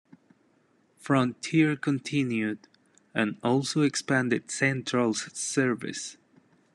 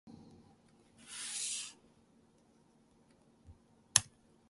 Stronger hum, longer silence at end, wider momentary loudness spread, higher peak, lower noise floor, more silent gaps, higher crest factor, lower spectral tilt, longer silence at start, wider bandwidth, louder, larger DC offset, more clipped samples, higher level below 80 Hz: neither; first, 0.6 s vs 0.4 s; second, 10 LU vs 27 LU; second, -10 dBFS vs -2 dBFS; about the same, -66 dBFS vs -68 dBFS; neither; second, 18 dB vs 42 dB; first, -4.5 dB/octave vs 0 dB/octave; first, 1.05 s vs 0.05 s; about the same, 12 kHz vs 12 kHz; first, -27 LUFS vs -35 LUFS; neither; neither; about the same, -72 dBFS vs -72 dBFS